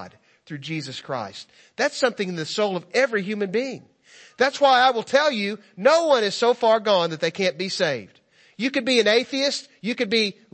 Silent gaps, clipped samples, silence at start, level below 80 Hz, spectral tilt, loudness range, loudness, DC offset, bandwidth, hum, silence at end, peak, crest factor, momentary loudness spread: none; under 0.1%; 0 s; -74 dBFS; -3.5 dB/octave; 6 LU; -22 LUFS; under 0.1%; 8.8 kHz; none; 0.2 s; -4 dBFS; 20 dB; 13 LU